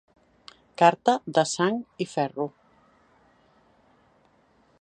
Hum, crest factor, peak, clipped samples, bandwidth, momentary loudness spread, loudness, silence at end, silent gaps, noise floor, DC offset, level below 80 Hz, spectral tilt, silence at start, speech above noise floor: none; 24 dB; -4 dBFS; under 0.1%; 10 kHz; 13 LU; -25 LUFS; 2.3 s; none; -63 dBFS; under 0.1%; -74 dBFS; -4.5 dB/octave; 0.8 s; 39 dB